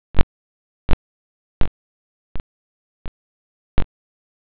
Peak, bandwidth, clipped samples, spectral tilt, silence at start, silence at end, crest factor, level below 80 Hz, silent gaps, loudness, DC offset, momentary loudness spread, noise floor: -2 dBFS; 4 kHz; under 0.1%; -10 dB/octave; 0.15 s; 0.55 s; 18 dB; -30 dBFS; 0.23-1.61 s, 1.68-3.78 s; -30 LUFS; under 0.1%; 20 LU; under -90 dBFS